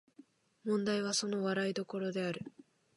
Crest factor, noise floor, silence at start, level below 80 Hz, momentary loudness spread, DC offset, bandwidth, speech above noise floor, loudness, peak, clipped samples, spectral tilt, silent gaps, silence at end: 16 dB; -63 dBFS; 0.65 s; -80 dBFS; 11 LU; under 0.1%; 11.5 kHz; 28 dB; -36 LUFS; -22 dBFS; under 0.1%; -4 dB/octave; none; 0.45 s